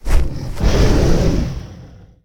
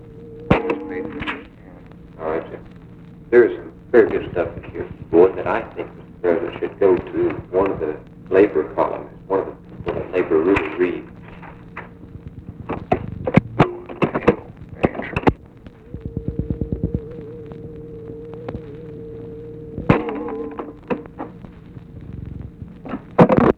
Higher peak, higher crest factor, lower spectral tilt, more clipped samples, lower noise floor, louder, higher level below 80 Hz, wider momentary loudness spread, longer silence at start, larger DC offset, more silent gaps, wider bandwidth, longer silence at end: about the same, 0 dBFS vs 0 dBFS; second, 14 dB vs 22 dB; second, -6.5 dB/octave vs -9 dB/octave; neither; about the same, -39 dBFS vs -42 dBFS; first, -18 LUFS vs -21 LUFS; first, -18 dBFS vs -40 dBFS; second, 13 LU vs 22 LU; about the same, 0.05 s vs 0 s; neither; neither; first, 16.5 kHz vs 6.4 kHz; first, 0.4 s vs 0.05 s